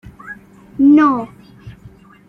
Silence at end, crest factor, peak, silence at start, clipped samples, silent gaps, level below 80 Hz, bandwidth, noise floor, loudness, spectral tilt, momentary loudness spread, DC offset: 0.6 s; 14 dB; -2 dBFS; 0.25 s; under 0.1%; none; -50 dBFS; 5.8 kHz; -43 dBFS; -13 LUFS; -8 dB/octave; 24 LU; under 0.1%